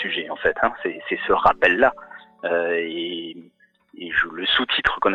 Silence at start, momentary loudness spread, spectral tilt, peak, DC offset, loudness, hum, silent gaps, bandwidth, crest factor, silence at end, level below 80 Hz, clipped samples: 0 s; 14 LU; -5 dB/octave; -4 dBFS; under 0.1%; -21 LUFS; none; none; 8.4 kHz; 18 dB; 0 s; -50 dBFS; under 0.1%